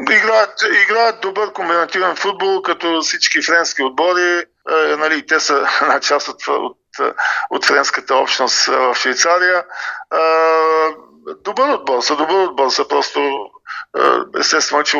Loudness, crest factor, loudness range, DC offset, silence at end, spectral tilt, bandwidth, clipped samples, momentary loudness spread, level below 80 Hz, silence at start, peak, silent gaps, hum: -15 LUFS; 16 dB; 2 LU; under 0.1%; 0 s; -0.5 dB/octave; 8.2 kHz; under 0.1%; 8 LU; -66 dBFS; 0 s; 0 dBFS; none; none